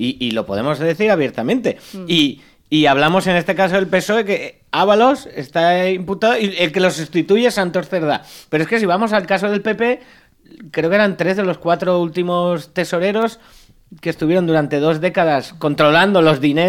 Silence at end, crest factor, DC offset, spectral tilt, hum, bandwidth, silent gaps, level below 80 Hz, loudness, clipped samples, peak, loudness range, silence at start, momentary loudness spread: 0 s; 16 dB; under 0.1%; -5.5 dB/octave; none; 16.5 kHz; none; -52 dBFS; -16 LUFS; under 0.1%; -2 dBFS; 3 LU; 0 s; 8 LU